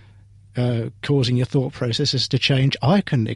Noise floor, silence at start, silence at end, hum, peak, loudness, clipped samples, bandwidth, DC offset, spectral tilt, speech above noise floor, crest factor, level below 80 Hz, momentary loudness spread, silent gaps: -48 dBFS; 0.55 s; 0 s; none; -6 dBFS; -20 LUFS; under 0.1%; 11 kHz; under 0.1%; -6 dB/octave; 28 dB; 16 dB; -50 dBFS; 6 LU; none